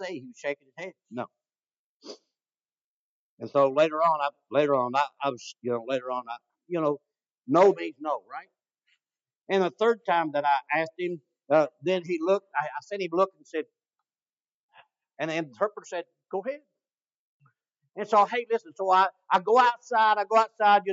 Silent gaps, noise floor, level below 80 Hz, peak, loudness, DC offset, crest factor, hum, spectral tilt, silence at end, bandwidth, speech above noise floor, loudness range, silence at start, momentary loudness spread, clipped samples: 1.73-2.00 s, 2.81-3.37 s, 7.38-7.43 s, 9.36-9.45 s, 14.33-14.37 s, 14.54-14.69 s, 16.94-16.98 s, 17.17-17.40 s; under -90 dBFS; under -90 dBFS; -8 dBFS; -26 LUFS; under 0.1%; 20 dB; none; -5 dB/octave; 0 s; 7.8 kHz; over 64 dB; 10 LU; 0 s; 17 LU; under 0.1%